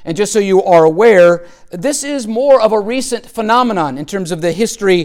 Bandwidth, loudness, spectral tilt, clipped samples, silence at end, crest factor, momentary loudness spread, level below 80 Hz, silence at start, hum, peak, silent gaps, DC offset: 16 kHz; -12 LUFS; -4.5 dB/octave; under 0.1%; 0 s; 12 dB; 12 LU; -46 dBFS; 0 s; none; 0 dBFS; none; under 0.1%